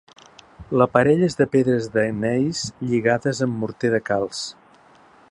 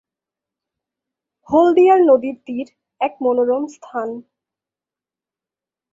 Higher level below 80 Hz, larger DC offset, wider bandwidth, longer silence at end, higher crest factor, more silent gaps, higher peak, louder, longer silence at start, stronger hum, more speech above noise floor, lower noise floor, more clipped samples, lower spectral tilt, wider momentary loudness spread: first, -54 dBFS vs -64 dBFS; neither; first, 11 kHz vs 7.6 kHz; second, 0.8 s vs 1.7 s; about the same, 20 dB vs 18 dB; neither; about the same, 0 dBFS vs -2 dBFS; second, -21 LUFS vs -16 LUFS; second, 0.6 s vs 1.5 s; neither; second, 31 dB vs 73 dB; second, -52 dBFS vs -89 dBFS; neither; about the same, -6 dB/octave vs -6 dB/octave; second, 9 LU vs 17 LU